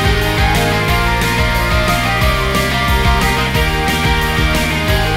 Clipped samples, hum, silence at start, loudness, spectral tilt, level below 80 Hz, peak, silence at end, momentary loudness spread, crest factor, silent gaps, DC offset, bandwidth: under 0.1%; none; 0 s; -14 LUFS; -4.5 dB/octave; -20 dBFS; -2 dBFS; 0 s; 1 LU; 12 dB; none; 1%; 16.5 kHz